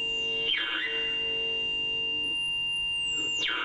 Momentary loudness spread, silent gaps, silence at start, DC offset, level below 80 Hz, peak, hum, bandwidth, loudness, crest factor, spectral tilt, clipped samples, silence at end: 1 LU; none; 0 s; under 0.1%; -58 dBFS; -18 dBFS; none; 10.5 kHz; -27 LUFS; 12 dB; -0.5 dB/octave; under 0.1%; 0 s